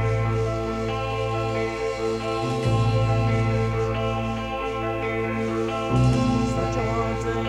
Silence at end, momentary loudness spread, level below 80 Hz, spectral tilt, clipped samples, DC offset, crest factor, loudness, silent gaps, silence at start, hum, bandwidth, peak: 0 s; 5 LU; -36 dBFS; -7 dB/octave; under 0.1%; under 0.1%; 16 dB; -24 LUFS; none; 0 s; none; 10.5 kHz; -8 dBFS